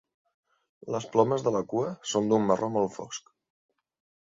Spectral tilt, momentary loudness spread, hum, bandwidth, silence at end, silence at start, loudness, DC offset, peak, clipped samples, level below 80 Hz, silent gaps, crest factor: -5.5 dB/octave; 15 LU; none; 7.8 kHz; 1.1 s; 0.85 s; -27 LUFS; under 0.1%; -8 dBFS; under 0.1%; -68 dBFS; none; 22 dB